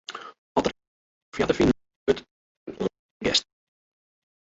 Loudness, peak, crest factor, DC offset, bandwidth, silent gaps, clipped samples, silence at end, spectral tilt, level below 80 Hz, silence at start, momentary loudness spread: -26 LUFS; -8 dBFS; 22 dB; under 0.1%; 8.2 kHz; 0.38-0.55 s, 0.87-1.32 s, 1.96-2.06 s, 2.31-2.66 s, 2.99-3.20 s; under 0.1%; 1.05 s; -4.5 dB/octave; -50 dBFS; 0.1 s; 17 LU